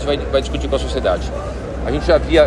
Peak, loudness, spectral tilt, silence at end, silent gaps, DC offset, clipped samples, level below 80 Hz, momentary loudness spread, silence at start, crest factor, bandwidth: 0 dBFS; -19 LUFS; -6 dB/octave; 0 s; none; under 0.1%; under 0.1%; -24 dBFS; 9 LU; 0 s; 16 dB; 11 kHz